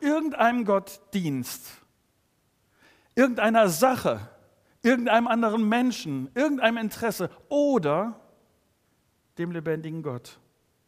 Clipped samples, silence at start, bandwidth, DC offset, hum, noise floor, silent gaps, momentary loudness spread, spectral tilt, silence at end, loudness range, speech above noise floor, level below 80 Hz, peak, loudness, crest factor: under 0.1%; 0 s; 15.5 kHz; under 0.1%; none; -69 dBFS; none; 13 LU; -5 dB/octave; 0.6 s; 6 LU; 45 dB; -68 dBFS; -6 dBFS; -25 LUFS; 22 dB